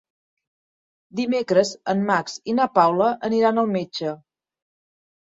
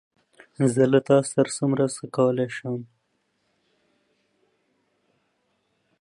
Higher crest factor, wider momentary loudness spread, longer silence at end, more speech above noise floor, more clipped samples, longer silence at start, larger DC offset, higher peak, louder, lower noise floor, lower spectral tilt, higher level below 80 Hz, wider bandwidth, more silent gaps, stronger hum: about the same, 20 dB vs 22 dB; about the same, 11 LU vs 11 LU; second, 1.1 s vs 3.15 s; first, over 69 dB vs 50 dB; neither; first, 1.15 s vs 0.6 s; neither; about the same, -2 dBFS vs -4 dBFS; about the same, -21 LUFS vs -23 LUFS; first, under -90 dBFS vs -72 dBFS; about the same, -5.5 dB/octave vs -6 dB/octave; about the same, -68 dBFS vs -72 dBFS; second, 7.8 kHz vs 11.5 kHz; neither; neither